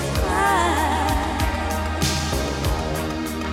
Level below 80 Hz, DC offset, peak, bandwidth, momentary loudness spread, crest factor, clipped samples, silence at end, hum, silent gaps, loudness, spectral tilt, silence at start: -28 dBFS; under 0.1%; -8 dBFS; 16.5 kHz; 7 LU; 14 dB; under 0.1%; 0 s; none; none; -22 LUFS; -4.5 dB/octave; 0 s